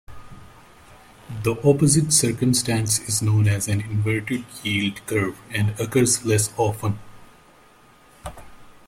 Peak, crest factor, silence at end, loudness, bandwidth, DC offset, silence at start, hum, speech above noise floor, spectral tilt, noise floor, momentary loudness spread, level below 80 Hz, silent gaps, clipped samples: -4 dBFS; 20 dB; 0.15 s; -21 LUFS; 16 kHz; under 0.1%; 0.1 s; none; 31 dB; -4.5 dB/octave; -52 dBFS; 11 LU; -50 dBFS; none; under 0.1%